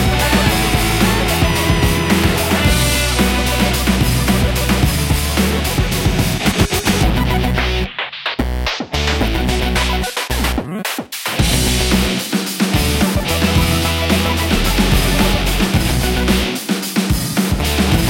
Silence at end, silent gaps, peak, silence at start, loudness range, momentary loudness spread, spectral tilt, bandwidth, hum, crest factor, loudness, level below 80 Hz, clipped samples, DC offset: 0 s; none; 0 dBFS; 0 s; 3 LU; 5 LU; -4.5 dB/octave; 17 kHz; none; 16 dB; -16 LUFS; -22 dBFS; under 0.1%; under 0.1%